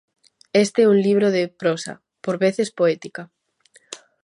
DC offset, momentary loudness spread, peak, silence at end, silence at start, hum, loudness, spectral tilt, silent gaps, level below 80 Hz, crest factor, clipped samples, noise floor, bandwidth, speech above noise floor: under 0.1%; 21 LU; -4 dBFS; 0.25 s; 0.55 s; none; -20 LUFS; -5.5 dB/octave; none; -72 dBFS; 16 dB; under 0.1%; -57 dBFS; 11.5 kHz; 38 dB